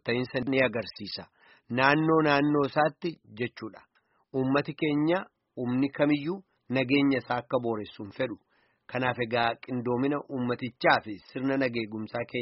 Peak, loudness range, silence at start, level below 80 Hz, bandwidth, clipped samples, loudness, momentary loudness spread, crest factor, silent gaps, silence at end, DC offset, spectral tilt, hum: -6 dBFS; 4 LU; 0.05 s; -66 dBFS; 5.8 kHz; under 0.1%; -28 LUFS; 13 LU; 22 dB; none; 0 s; under 0.1%; -4.5 dB/octave; none